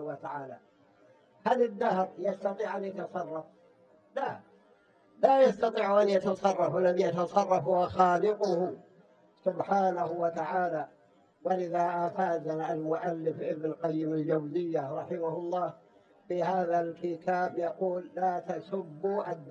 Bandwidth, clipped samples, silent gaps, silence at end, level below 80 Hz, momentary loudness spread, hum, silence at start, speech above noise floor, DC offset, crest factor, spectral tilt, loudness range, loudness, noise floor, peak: 8.6 kHz; under 0.1%; none; 0 s; -72 dBFS; 12 LU; none; 0 s; 34 dB; under 0.1%; 22 dB; -7 dB/octave; 6 LU; -30 LUFS; -63 dBFS; -8 dBFS